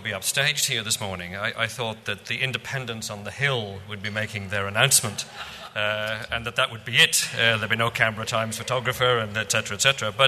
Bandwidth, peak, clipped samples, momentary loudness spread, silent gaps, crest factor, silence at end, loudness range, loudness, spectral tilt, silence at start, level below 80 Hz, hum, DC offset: 13.5 kHz; -2 dBFS; under 0.1%; 13 LU; none; 24 dB; 0 s; 6 LU; -23 LUFS; -2 dB/octave; 0 s; -56 dBFS; none; under 0.1%